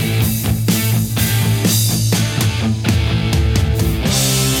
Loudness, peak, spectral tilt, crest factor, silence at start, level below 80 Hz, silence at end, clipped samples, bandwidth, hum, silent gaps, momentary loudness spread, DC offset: -16 LUFS; -2 dBFS; -4.5 dB/octave; 12 dB; 0 s; -26 dBFS; 0 s; under 0.1%; 19 kHz; none; none; 3 LU; under 0.1%